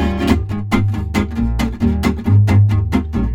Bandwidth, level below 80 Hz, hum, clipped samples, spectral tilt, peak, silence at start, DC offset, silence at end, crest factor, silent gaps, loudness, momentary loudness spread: 14.5 kHz; -24 dBFS; none; under 0.1%; -7.5 dB/octave; 0 dBFS; 0 s; under 0.1%; 0 s; 14 dB; none; -16 LUFS; 7 LU